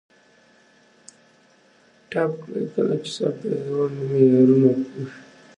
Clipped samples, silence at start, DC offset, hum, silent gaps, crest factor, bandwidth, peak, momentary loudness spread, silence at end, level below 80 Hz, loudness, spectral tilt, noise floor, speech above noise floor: under 0.1%; 2.1 s; under 0.1%; none; none; 18 dB; 10 kHz; -4 dBFS; 14 LU; 0.35 s; -72 dBFS; -21 LUFS; -7.5 dB/octave; -57 dBFS; 36 dB